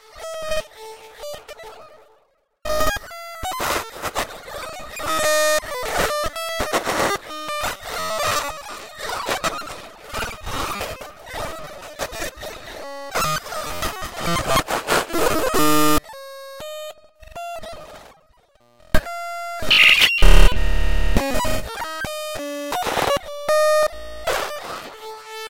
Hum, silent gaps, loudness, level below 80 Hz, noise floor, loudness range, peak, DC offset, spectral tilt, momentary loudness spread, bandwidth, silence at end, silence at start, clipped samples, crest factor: none; none; -21 LUFS; -28 dBFS; -62 dBFS; 12 LU; 0 dBFS; under 0.1%; -3 dB/octave; 18 LU; 17 kHz; 0 s; 0 s; under 0.1%; 20 dB